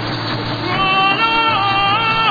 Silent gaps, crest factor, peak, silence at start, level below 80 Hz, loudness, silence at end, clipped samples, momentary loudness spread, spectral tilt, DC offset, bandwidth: none; 14 dB; -2 dBFS; 0 s; -42 dBFS; -14 LUFS; 0 s; under 0.1%; 8 LU; -5.5 dB/octave; 0.4%; 5 kHz